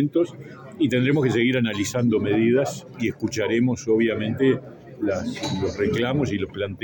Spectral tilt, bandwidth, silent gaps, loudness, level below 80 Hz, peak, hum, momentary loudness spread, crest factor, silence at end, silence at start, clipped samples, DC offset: -6 dB/octave; 17 kHz; none; -23 LUFS; -56 dBFS; -8 dBFS; none; 8 LU; 14 dB; 0.05 s; 0 s; under 0.1%; under 0.1%